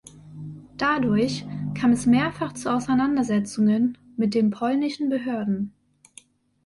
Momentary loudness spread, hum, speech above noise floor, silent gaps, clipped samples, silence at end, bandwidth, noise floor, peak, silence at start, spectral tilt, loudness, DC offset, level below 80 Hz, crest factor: 12 LU; none; 31 dB; none; under 0.1%; 0.95 s; 11.5 kHz; -53 dBFS; -10 dBFS; 0.15 s; -6 dB/octave; -23 LUFS; under 0.1%; -56 dBFS; 14 dB